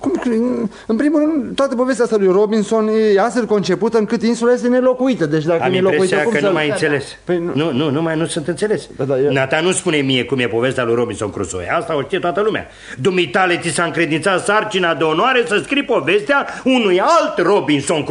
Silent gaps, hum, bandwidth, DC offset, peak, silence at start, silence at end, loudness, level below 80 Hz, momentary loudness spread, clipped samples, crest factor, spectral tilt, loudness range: none; none; 11 kHz; under 0.1%; -2 dBFS; 0 s; 0 s; -16 LUFS; -52 dBFS; 6 LU; under 0.1%; 14 dB; -5 dB/octave; 3 LU